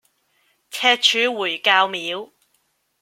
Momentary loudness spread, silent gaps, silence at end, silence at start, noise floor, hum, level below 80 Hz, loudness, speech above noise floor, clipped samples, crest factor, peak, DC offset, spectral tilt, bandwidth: 14 LU; none; 0.75 s; 0.7 s; -67 dBFS; none; -80 dBFS; -18 LUFS; 48 dB; under 0.1%; 22 dB; 0 dBFS; under 0.1%; -0.5 dB/octave; 16.5 kHz